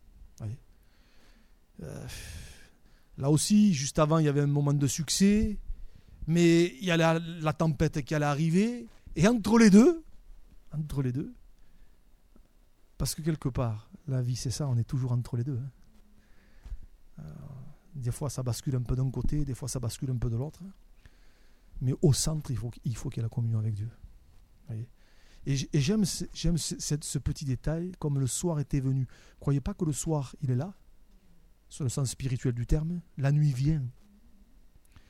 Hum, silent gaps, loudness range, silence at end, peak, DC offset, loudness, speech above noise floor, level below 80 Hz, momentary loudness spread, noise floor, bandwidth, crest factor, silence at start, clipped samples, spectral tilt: none; none; 10 LU; 1.2 s; -8 dBFS; under 0.1%; -29 LUFS; 31 dB; -44 dBFS; 18 LU; -59 dBFS; 16 kHz; 22 dB; 0.2 s; under 0.1%; -6 dB/octave